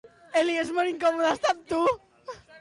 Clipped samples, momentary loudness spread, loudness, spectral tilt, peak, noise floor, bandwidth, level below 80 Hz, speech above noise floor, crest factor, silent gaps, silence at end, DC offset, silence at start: under 0.1%; 17 LU; -26 LUFS; -3.5 dB/octave; -14 dBFS; -44 dBFS; 11.5 kHz; -62 dBFS; 19 dB; 12 dB; none; 0 s; under 0.1%; 0.35 s